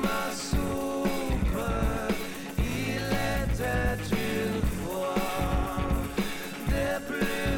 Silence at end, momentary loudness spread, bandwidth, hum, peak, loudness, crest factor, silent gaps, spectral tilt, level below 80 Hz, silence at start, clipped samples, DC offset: 0 s; 3 LU; 18 kHz; none; -16 dBFS; -30 LUFS; 12 dB; none; -5.5 dB/octave; -34 dBFS; 0 s; under 0.1%; under 0.1%